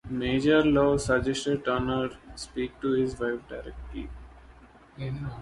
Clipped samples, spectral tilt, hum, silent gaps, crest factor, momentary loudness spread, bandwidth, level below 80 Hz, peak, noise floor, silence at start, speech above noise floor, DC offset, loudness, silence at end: under 0.1%; -6 dB/octave; none; none; 18 dB; 18 LU; 11.5 kHz; -46 dBFS; -10 dBFS; -53 dBFS; 0.05 s; 25 dB; under 0.1%; -27 LUFS; 0 s